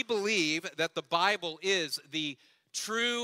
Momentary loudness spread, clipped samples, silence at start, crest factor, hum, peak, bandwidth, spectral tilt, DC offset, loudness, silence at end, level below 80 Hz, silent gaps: 10 LU; under 0.1%; 0 s; 20 dB; none; -12 dBFS; 16 kHz; -2 dB/octave; under 0.1%; -31 LUFS; 0 s; -80 dBFS; none